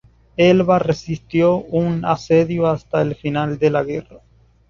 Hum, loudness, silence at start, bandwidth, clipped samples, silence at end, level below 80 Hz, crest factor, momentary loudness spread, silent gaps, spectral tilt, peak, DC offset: none; -18 LUFS; 0.4 s; 7.4 kHz; under 0.1%; 0.5 s; -48 dBFS; 16 dB; 8 LU; none; -7.5 dB/octave; -2 dBFS; under 0.1%